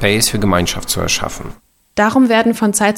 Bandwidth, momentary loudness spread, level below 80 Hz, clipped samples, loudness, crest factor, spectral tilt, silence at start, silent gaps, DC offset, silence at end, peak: 17 kHz; 13 LU; -34 dBFS; under 0.1%; -14 LUFS; 14 dB; -3.5 dB/octave; 0 s; none; under 0.1%; 0 s; 0 dBFS